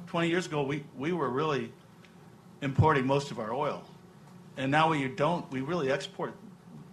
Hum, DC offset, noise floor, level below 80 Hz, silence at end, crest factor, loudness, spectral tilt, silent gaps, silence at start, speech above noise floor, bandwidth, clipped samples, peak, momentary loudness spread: none; under 0.1%; -54 dBFS; -54 dBFS; 0 s; 20 dB; -30 LUFS; -6.5 dB/octave; none; 0 s; 24 dB; 12.5 kHz; under 0.1%; -12 dBFS; 15 LU